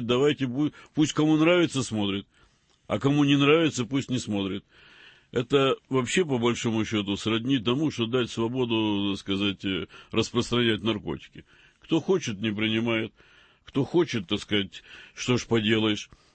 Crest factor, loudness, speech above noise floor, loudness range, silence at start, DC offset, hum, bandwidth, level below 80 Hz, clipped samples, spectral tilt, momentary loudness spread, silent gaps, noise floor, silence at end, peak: 18 dB; -26 LUFS; 24 dB; 4 LU; 0 s; under 0.1%; none; 8.8 kHz; -58 dBFS; under 0.1%; -5 dB/octave; 11 LU; none; -49 dBFS; 0.3 s; -8 dBFS